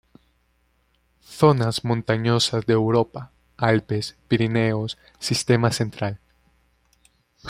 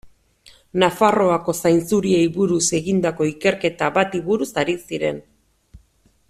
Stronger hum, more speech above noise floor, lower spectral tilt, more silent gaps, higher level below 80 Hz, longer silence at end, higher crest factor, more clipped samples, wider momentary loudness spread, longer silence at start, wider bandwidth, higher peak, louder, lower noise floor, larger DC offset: neither; first, 44 dB vs 40 dB; about the same, -5.5 dB/octave vs -4.5 dB/octave; neither; about the same, -54 dBFS vs -54 dBFS; second, 0 s vs 0.55 s; about the same, 22 dB vs 18 dB; neither; first, 11 LU vs 7 LU; first, 1.3 s vs 0.05 s; about the same, 15 kHz vs 15 kHz; about the same, -2 dBFS vs -2 dBFS; second, -22 LUFS vs -19 LUFS; first, -65 dBFS vs -59 dBFS; neither